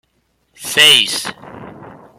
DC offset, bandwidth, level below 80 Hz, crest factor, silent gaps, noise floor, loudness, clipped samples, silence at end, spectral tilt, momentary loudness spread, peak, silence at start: under 0.1%; 16.5 kHz; -60 dBFS; 18 dB; none; -63 dBFS; -10 LUFS; under 0.1%; 0.25 s; 0 dB/octave; 20 LU; 0 dBFS; 0.6 s